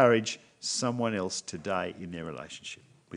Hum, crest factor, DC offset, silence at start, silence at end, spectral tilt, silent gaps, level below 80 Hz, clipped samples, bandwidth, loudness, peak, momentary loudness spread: none; 24 dB; under 0.1%; 0 s; 0 s; -4 dB/octave; none; -72 dBFS; under 0.1%; 10.5 kHz; -32 LUFS; -8 dBFS; 13 LU